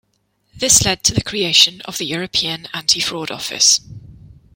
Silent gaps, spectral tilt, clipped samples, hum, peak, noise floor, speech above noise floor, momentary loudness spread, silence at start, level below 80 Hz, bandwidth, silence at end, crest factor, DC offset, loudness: none; -1 dB/octave; under 0.1%; none; 0 dBFS; -65 dBFS; 48 dB; 11 LU; 0.55 s; -44 dBFS; 17 kHz; 0.4 s; 18 dB; under 0.1%; -15 LUFS